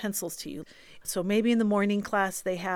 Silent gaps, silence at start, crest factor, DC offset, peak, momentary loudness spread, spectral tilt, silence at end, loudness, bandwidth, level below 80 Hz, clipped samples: none; 0 s; 16 dB; under 0.1%; -12 dBFS; 15 LU; -4.5 dB/octave; 0 s; -28 LUFS; 18 kHz; -62 dBFS; under 0.1%